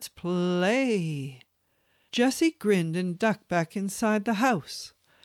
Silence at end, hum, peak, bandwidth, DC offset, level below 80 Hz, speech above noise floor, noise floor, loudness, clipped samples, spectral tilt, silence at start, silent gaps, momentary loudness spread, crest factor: 0.35 s; none; -10 dBFS; 16 kHz; under 0.1%; -68 dBFS; 45 dB; -71 dBFS; -27 LUFS; under 0.1%; -5.5 dB/octave; 0 s; none; 11 LU; 16 dB